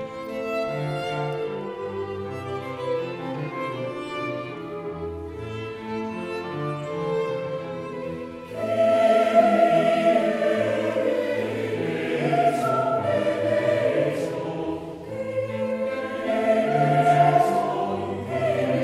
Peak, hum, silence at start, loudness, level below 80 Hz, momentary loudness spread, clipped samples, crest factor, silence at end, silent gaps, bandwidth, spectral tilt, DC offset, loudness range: -6 dBFS; none; 0 s; -24 LUFS; -58 dBFS; 14 LU; under 0.1%; 18 dB; 0 s; none; 13 kHz; -6.5 dB/octave; under 0.1%; 10 LU